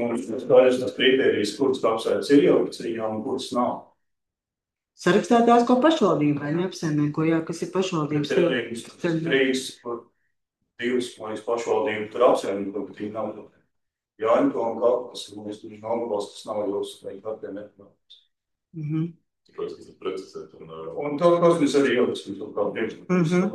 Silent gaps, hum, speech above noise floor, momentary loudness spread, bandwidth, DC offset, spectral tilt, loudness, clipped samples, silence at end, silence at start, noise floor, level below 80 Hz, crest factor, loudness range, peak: none; none; 65 dB; 17 LU; 12.5 kHz; under 0.1%; -6 dB/octave; -23 LUFS; under 0.1%; 0 s; 0 s; -88 dBFS; -72 dBFS; 20 dB; 11 LU; -4 dBFS